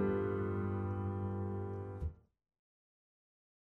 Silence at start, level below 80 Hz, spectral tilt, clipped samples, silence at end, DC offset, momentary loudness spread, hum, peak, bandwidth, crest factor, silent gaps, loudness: 0 s; -56 dBFS; -11 dB/octave; under 0.1%; 1.6 s; under 0.1%; 8 LU; none; -26 dBFS; 3.4 kHz; 14 dB; none; -39 LUFS